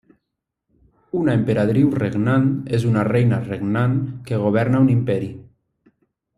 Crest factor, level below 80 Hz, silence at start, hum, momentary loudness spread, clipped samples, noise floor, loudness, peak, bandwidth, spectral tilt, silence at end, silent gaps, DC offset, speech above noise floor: 16 dB; -52 dBFS; 1.15 s; none; 7 LU; under 0.1%; -80 dBFS; -19 LUFS; -4 dBFS; 11 kHz; -9 dB/octave; 0.95 s; none; under 0.1%; 62 dB